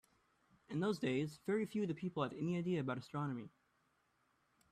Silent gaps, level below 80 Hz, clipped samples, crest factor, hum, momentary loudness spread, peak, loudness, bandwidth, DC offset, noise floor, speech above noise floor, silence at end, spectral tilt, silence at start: none; -78 dBFS; under 0.1%; 18 dB; none; 6 LU; -24 dBFS; -41 LUFS; 14 kHz; under 0.1%; -79 dBFS; 39 dB; 1.25 s; -7 dB/octave; 0.7 s